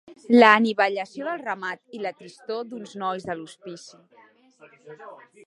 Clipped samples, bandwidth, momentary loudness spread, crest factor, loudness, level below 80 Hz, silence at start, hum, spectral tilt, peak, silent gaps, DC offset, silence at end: under 0.1%; 10.5 kHz; 26 LU; 24 dB; -22 LUFS; -74 dBFS; 0.1 s; none; -5 dB/octave; 0 dBFS; none; under 0.1%; 0.3 s